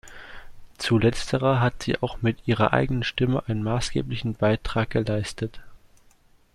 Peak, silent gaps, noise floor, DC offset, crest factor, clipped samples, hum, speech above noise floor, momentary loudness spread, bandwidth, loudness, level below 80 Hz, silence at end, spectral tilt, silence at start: -4 dBFS; none; -57 dBFS; under 0.1%; 22 dB; under 0.1%; none; 33 dB; 10 LU; 12.5 kHz; -25 LUFS; -42 dBFS; 0.8 s; -6 dB/octave; 0.05 s